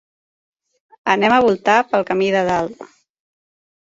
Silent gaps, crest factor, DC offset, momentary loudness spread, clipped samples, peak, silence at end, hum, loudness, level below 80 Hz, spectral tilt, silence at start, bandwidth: none; 18 dB; under 0.1%; 8 LU; under 0.1%; 0 dBFS; 1.1 s; none; -16 LUFS; -56 dBFS; -5 dB/octave; 1.05 s; 7.8 kHz